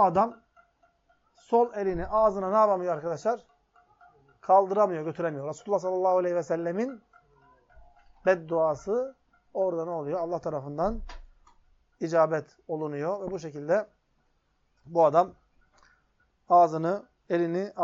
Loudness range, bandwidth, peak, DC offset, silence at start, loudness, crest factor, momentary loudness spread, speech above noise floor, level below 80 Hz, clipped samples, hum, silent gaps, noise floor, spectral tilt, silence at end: 4 LU; 7.6 kHz; -8 dBFS; under 0.1%; 0 s; -27 LUFS; 20 dB; 13 LU; 45 dB; -54 dBFS; under 0.1%; none; none; -71 dBFS; -6.5 dB/octave; 0 s